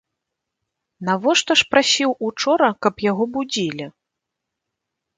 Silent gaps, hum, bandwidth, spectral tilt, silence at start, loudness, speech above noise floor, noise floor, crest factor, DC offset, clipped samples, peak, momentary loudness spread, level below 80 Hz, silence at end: none; none; 9.6 kHz; -3 dB/octave; 1 s; -18 LUFS; 63 dB; -82 dBFS; 20 dB; under 0.1%; under 0.1%; 0 dBFS; 11 LU; -62 dBFS; 1.3 s